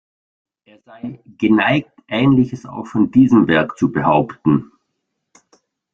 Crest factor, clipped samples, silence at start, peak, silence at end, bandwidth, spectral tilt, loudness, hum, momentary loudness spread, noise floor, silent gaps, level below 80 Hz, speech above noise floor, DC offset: 16 dB; under 0.1%; 1.05 s; -2 dBFS; 1.3 s; 7.4 kHz; -8 dB/octave; -16 LUFS; none; 18 LU; -74 dBFS; none; -52 dBFS; 58 dB; under 0.1%